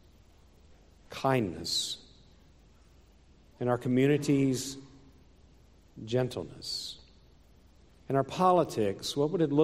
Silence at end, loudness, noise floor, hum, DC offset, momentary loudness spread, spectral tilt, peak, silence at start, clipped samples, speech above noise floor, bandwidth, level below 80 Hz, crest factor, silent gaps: 0 s; -30 LUFS; -59 dBFS; none; under 0.1%; 15 LU; -5.5 dB/octave; -12 dBFS; 1.1 s; under 0.1%; 31 dB; 16 kHz; -62 dBFS; 20 dB; none